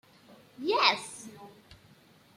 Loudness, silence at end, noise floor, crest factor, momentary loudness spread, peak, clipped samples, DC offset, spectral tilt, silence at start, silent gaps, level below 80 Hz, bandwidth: -27 LUFS; 0.9 s; -60 dBFS; 26 dB; 21 LU; -8 dBFS; under 0.1%; under 0.1%; -2 dB/octave; 0.6 s; none; -74 dBFS; 16 kHz